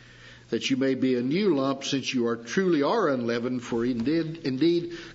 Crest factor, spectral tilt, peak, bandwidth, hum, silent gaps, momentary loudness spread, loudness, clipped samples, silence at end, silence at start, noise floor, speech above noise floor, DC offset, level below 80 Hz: 14 dB; -5.5 dB/octave; -12 dBFS; 8 kHz; none; none; 5 LU; -26 LUFS; under 0.1%; 0 s; 0 s; -49 dBFS; 24 dB; under 0.1%; -62 dBFS